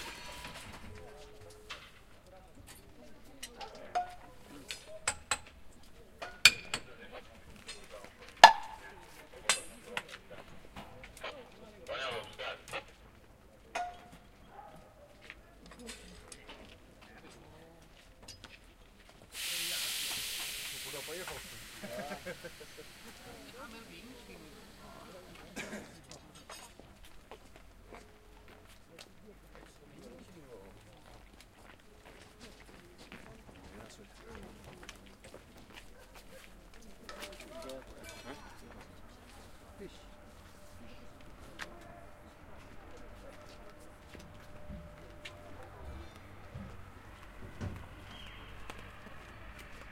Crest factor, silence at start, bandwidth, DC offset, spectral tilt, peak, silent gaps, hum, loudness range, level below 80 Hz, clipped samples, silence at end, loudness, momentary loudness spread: 40 dB; 0 s; 16 kHz; under 0.1%; -1.5 dB/octave; 0 dBFS; none; none; 25 LU; -60 dBFS; under 0.1%; 0 s; -34 LUFS; 19 LU